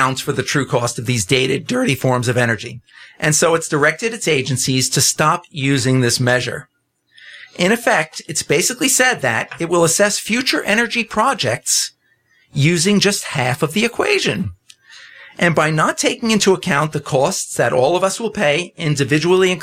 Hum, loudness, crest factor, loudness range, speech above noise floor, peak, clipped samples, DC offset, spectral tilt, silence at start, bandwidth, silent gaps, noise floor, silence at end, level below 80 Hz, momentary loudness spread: none; -16 LUFS; 14 dB; 2 LU; 42 dB; -2 dBFS; under 0.1%; under 0.1%; -3.5 dB/octave; 0 s; 16.5 kHz; none; -58 dBFS; 0 s; -54 dBFS; 6 LU